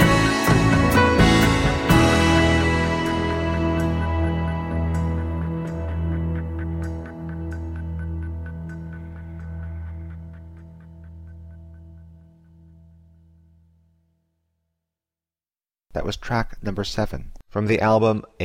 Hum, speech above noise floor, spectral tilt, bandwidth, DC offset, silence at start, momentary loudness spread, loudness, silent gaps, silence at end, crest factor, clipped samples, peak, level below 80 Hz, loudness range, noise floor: none; over 67 dB; -6 dB/octave; 16 kHz; under 0.1%; 0 s; 20 LU; -21 LUFS; none; 0 s; 18 dB; under 0.1%; -4 dBFS; -32 dBFS; 21 LU; under -90 dBFS